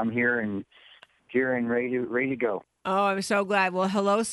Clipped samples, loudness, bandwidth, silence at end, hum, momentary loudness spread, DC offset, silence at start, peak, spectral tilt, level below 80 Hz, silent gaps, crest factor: under 0.1%; -26 LUFS; 11.5 kHz; 0 s; none; 6 LU; under 0.1%; 0 s; -12 dBFS; -5 dB/octave; -68 dBFS; none; 16 dB